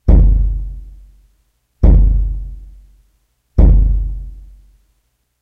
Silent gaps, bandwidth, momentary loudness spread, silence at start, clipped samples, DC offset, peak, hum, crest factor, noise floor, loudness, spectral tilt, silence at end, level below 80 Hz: none; 1.9 kHz; 22 LU; 0.05 s; under 0.1%; under 0.1%; 0 dBFS; none; 14 dB; -64 dBFS; -15 LUFS; -11.5 dB/octave; 1 s; -14 dBFS